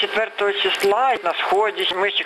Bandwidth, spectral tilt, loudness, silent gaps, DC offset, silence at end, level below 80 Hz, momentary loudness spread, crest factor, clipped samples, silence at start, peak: 13.5 kHz; -2 dB/octave; -19 LUFS; none; under 0.1%; 0 s; -64 dBFS; 3 LU; 12 dB; under 0.1%; 0 s; -8 dBFS